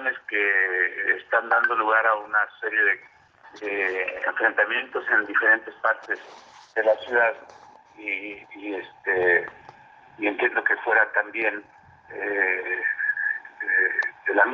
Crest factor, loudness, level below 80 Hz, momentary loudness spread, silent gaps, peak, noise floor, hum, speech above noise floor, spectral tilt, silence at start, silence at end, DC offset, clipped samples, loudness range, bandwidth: 20 dB; -23 LUFS; -74 dBFS; 12 LU; none; -6 dBFS; -49 dBFS; none; 25 dB; -4.5 dB/octave; 0 s; 0 s; under 0.1%; under 0.1%; 4 LU; 7.2 kHz